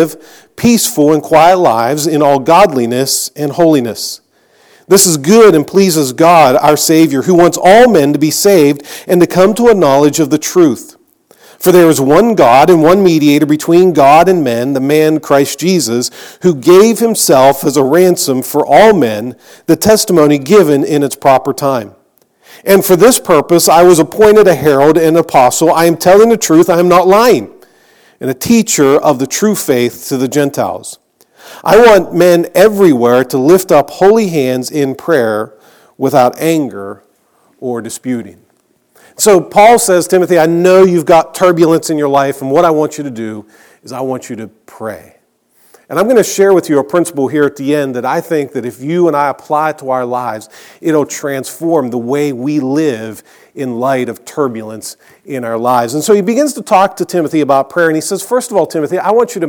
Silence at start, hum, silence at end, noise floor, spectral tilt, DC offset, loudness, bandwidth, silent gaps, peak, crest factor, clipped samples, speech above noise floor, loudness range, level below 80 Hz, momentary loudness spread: 0 s; none; 0 s; -55 dBFS; -4.5 dB/octave; under 0.1%; -9 LUFS; over 20 kHz; none; 0 dBFS; 10 dB; 1%; 46 dB; 8 LU; -46 dBFS; 14 LU